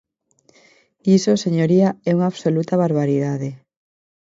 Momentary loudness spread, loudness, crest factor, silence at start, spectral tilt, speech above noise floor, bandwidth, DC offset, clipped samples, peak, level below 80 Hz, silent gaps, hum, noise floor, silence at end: 9 LU; -18 LUFS; 16 dB; 1.05 s; -7 dB/octave; 43 dB; 7.8 kHz; under 0.1%; under 0.1%; -4 dBFS; -64 dBFS; none; none; -60 dBFS; 0.65 s